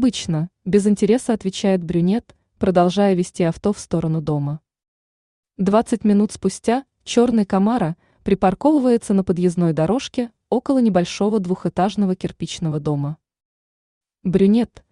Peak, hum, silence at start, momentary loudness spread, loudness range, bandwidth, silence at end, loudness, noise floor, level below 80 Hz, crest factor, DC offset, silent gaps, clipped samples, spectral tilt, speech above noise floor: -4 dBFS; none; 0 s; 8 LU; 3 LU; 11 kHz; 0.25 s; -19 LUFS; under -90 dBFS; -50 dBFS; 16 dB; under 0.1%; 4.88-5.43 s, 13.45-14.01 s; under 0.1%; -7 dB/octave; over 72 dB